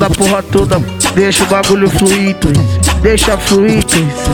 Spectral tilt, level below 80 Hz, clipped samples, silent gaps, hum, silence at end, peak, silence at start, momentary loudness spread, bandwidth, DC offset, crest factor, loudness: -4.5 dB/octave; -22 dBFS; under 0.1%; none; none; 0 s; 0 dBFS; 0 s; 2 LU; 19.5 kHz; under 0.1%; 10 dB; -10 LUFS